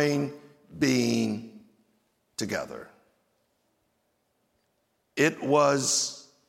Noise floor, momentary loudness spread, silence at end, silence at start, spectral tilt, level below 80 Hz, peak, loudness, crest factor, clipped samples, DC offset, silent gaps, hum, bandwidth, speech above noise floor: -74 dBFS; 16 LU; 0.3 s; 0 s; -3.5 dB/octave; -70 dBFS; -8 dBFS; -26 LUFS; 20 dB; under 0.1%; under 0.1%; none; none; 16.5 kHz; 48 dB